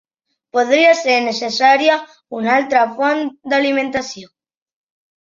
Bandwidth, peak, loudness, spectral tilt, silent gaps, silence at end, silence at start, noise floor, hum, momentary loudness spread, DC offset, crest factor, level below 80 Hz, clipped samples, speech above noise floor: 7.6 kHz; -2 dBFS; -15 LUFS; -3 dB/octave; none; 0.95 s; 0.55 s; -66 dBFS; none; 11 LU; under 0.1%; 16 dB; -62 dBFS; under 0.1%; 50 dB